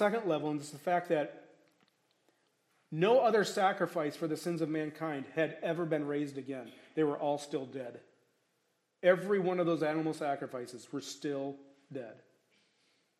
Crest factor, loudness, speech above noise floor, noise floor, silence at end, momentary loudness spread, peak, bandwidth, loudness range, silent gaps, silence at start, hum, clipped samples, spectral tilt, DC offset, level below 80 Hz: 22 dB; -34 LUFS; 45 dB; -78 dBFS; 1.05 s; 15 LU; -12 dBFS; 14 kHz; 5 LU; none; 0 s; none; under 0.1%; -5.5 dB/octave; under 0.1%; -88 dBFS